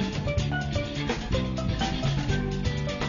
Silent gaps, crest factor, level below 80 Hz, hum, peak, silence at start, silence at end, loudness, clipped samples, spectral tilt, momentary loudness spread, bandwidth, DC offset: none; 14 dB; -36 dBFS; none; -14 dBFS; 0 s; 0 s; -28 LUFS; under 0.1%; -6 dB/octave; 2 LU; 7.4 kHz; under 0.1%